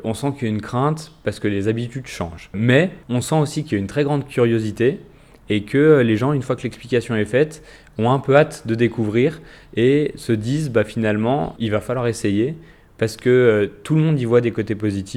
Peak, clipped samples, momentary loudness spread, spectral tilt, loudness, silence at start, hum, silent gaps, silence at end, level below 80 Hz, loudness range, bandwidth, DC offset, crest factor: 0 dBFS; under 0.1%; 10 LU; -7 dB/octave; -19 LUFS; 0 s; none; none; 0 s; -50 dBFS; 2 LU; 14.5 kHz; under 0.1%; 20 dB